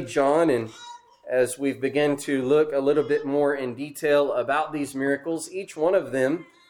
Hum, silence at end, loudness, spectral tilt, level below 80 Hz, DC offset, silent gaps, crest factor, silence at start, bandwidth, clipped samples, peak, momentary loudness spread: none; 0.25 s; -24 LUFS; -5 dB/octave; -66 dBFS; under 0.1%; none; 14 dB; 0 s; 19 kHz; under 0.1%; -8 dBFS; 9 LU